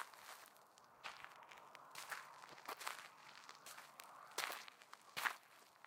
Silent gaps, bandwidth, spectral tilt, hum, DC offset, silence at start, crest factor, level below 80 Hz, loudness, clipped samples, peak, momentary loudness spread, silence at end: none; 17 kHz; 0.5 dB/octave; none; under 0.1%; 0 s; 30 dB; under -90 dBFS; -51 LUFS; under 0.1%; -22 dBFS; 15 LU; 0 s